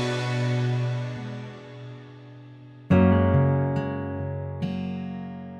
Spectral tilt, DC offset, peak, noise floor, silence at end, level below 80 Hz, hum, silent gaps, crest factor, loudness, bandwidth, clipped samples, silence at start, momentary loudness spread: -8 dB/octave; under 0.1%; -8 dBFS; -45 dBFS; 0 s; -50 dBFS; none; none; 18 dB; -25 LUFS; 9.4 kHz; under 0.1%; 0 s; 24 LU